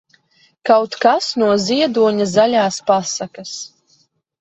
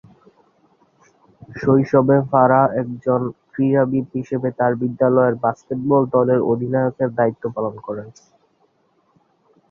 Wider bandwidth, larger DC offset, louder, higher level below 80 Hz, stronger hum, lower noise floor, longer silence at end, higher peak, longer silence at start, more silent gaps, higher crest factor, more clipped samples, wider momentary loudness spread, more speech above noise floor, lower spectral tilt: first, 8.4 kHz vs 6.8 kHz; neither; about the same, -16 LUFS vs -18 LUFS; about the same, -62 dBFS vs -58 dBFS; neither; second, -59 dBFS vs -63 dBFS; second, 0.75 s vs 1.6 s; about the same, 0 dBFS vs -2 dBFS; second, 0.65 s vs 1.5 s; neither; about the same, 16 dB vs 18 dB; neither; first, 14 LU vs 11 LU; about the same, 43 dB vs 45 dB; second, -4 dB/octave vs -10 dB/octave